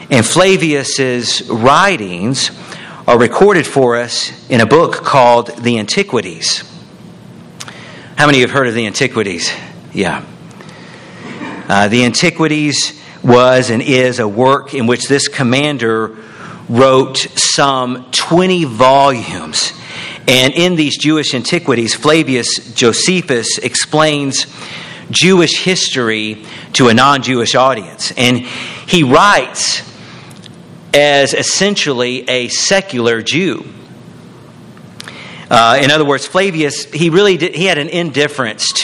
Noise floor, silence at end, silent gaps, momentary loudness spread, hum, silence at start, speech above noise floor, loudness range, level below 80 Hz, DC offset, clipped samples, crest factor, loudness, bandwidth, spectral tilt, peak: -35 dBFS; 0 s; none; 13 LU; none; 0 s; 24 dB; 4 LU; -48 dBFS; under 0.1%; 0.3%; 12 dB; -11 LUFS; 14 kHz; -3.5 dB/octave; 0 dBFS